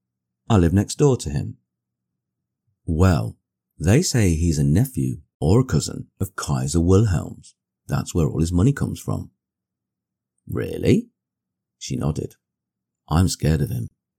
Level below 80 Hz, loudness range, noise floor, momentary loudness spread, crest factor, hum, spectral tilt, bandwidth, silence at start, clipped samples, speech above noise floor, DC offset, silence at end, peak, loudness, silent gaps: -38 dBFS; 7 LU; -85 dBFS; 12 LU; 16 dB; none; -6.5 dB/octave; 17 kHz; 0.5 s; under 0.1%; 65 dB; under 0.1%; 0.3 s; -6 dBFS; -21 LUFS; 5.34-5.40 s